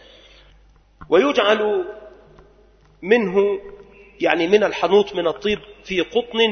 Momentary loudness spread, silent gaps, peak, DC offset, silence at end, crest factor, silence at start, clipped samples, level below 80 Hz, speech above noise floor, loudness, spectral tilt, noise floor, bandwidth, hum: 10 LU; none; 0 dBFS; under 0.1%; 0 s; 20 dB; 1 s; under 0.1%; -52 dBFS; 34 dB; -19 LUFS; -5 dB/octave; -52 dBFS; 6.6 kHz; none